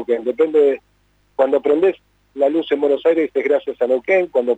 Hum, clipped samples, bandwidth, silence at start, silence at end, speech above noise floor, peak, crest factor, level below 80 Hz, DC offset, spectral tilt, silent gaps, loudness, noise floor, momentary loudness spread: 50 Hz at -60 dBFS; under 0.1%; 8 kHz; 0 s; 0 s; 43 dB; -6 dBFS; 12 dB; -62 dBFS; under 0.1%; -6 dB/octave; none; -17 LUFS; -60 dBFS; 6 LU